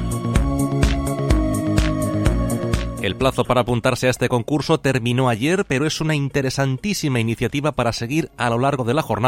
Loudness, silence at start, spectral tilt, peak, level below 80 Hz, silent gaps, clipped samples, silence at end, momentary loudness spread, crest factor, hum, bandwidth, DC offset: -20 LUFS; 0 s; -5.5 dB/octave; -2 dBFS; -28 dBFS; none; under 0.1%; 0 s; 3 LU; 18 dB; none; 16.5 kHz; under 0.1%